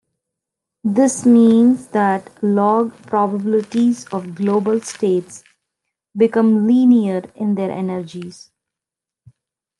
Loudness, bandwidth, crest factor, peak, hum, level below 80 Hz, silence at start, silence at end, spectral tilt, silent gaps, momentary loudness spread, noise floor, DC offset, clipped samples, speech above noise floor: -16 LUFS; 11.5 kHz; 14 dB; -4 dBFS; none; -68 dBFS; 0.85 s; 1.5 s; -6.5 dB/octave; none; 12 LU; -86 dBFS; under 0.1%; under 0.1%; 71 dB